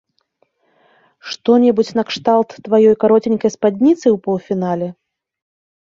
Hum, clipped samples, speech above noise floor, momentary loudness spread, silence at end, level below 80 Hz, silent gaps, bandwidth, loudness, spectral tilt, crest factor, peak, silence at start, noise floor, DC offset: none; under 0.1%; 49 dB; 10 LU; 0.95 s; -60 dBFS; none; 7.4 kHz; -15 LUFS; -6.5 dB/octave; 14 dB; -2 dBFS; 1.25 s; -63 dBFS; under 0.1%